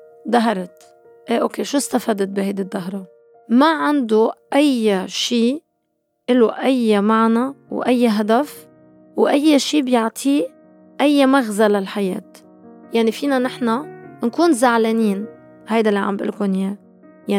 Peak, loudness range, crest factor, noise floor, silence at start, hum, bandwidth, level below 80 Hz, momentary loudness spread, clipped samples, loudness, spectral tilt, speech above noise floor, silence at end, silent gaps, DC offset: -2 dBFS; 3 LU; 16 dB; -70 dBFS; 0.25 s; none; 16 kHz; -74 dBFS; 12 LU; under 0.1%; -18 LUFS; -5 dB/octave; 53 dB; 0 s; none; under 0.1%